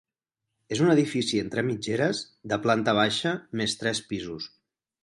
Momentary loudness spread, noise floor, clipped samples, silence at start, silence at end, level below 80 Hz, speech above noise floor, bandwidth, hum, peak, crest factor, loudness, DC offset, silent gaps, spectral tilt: 11 LU; -86 dBFS; under 0.1%; 0.7 s; 0.55 s; -62 dBFS; 60 dB; 11.5 kHz; none; -8 dBFS; 20 dB; -26 LUFS; under 0.1%; none; -4.5 dB/octave